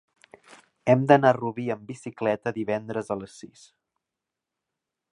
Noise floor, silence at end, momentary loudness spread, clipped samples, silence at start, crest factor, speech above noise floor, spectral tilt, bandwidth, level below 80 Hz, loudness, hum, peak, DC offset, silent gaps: -87 dBFS; 1.65 s; 16 LU; under 0.1%; 0.85 s; 24 dB; 62 dB; -7 dB/octave; 11 kHz; -68 dBFS; -25 LUFS; none; -2 dBFS; under 0.1%; none